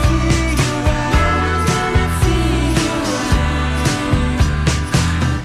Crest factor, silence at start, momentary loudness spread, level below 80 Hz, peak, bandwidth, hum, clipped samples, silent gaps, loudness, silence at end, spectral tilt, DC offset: 12 dB; 0 s; 2 LU; -20 dBFS; -2 dBFS; 14.5 kHz; none; under 0.1%; none; -16 LUFS; 0 s; -5 dB/octave; under 0.1%